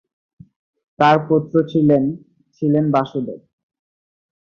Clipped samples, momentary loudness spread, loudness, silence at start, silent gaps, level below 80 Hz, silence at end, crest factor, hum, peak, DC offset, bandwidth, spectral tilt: under 0.1%; 14 LU; -17 LUFS; 1 s; none; -58 dBFS; 1.05 s; 18 dB; none; -2 dBFS; under 0.1%; 6.8 kHz; -8.5 dB/octave